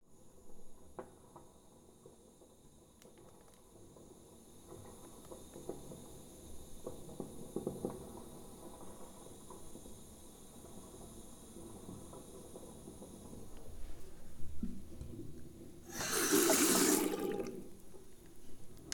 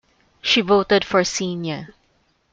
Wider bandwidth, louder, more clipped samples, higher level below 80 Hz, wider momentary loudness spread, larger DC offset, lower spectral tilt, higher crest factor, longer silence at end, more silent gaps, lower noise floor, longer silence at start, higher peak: first, 19 kHz vs 9 kHz; second, -36 LUFS vs -19 LUFS; neither; about the same, -58 dBFS vs -54 dBFS; first, 27 LU vs 12 LU; neither; about the same, -3 dB/octave vs -3.5 dB/octave; first, 26 dB vs 18 dB; second, 0 s vs 0.65 s; neither; about the same, -62 dBFS vs -63 dBFS; second, 0 s vs 0.45 s; second, -16 dBFS vs -4 dBFS